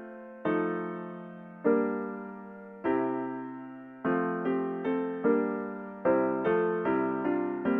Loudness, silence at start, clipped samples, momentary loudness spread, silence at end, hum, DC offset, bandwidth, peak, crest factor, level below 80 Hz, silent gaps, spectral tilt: -30 LUFS; 0 s; under 0.1%; 15 LU; 0 s; none; under 0.1%; 3.8 kHz; -14 dBFS; 16 dB; -74 dBFS; none; -10.5 dB/octave